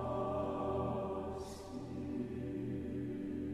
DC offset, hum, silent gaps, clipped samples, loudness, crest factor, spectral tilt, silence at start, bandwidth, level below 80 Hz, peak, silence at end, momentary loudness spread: under 0.1%; none; none; under 0.1%; -41 LUFS; 14 dB; -8 dB/octave; 0 s; 13 kHz; -56 dBFS; -26 dBFS; 0 s; 8 LU